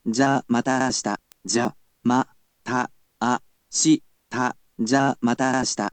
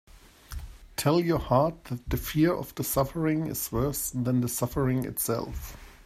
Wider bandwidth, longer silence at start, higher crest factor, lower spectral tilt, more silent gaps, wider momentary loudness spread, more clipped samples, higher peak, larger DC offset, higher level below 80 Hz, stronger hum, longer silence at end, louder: second, 9.2 kHz vs 16 kHz; about the same, 0.05 s vs 0.15 s; about the same, 18 dB vs 20 dB; second, -4 dB/octave vs -5.5 dB/octave; neither; second, 9 LU vs 15 LU; neither; about the same, -6 dBFS vs -8 dBFS; neither; second, -62 dBFS vs -44 dBFS; neither; about the same, 0.05 s vs 0.1 s; first, -23 LUFS vs -28 LUFS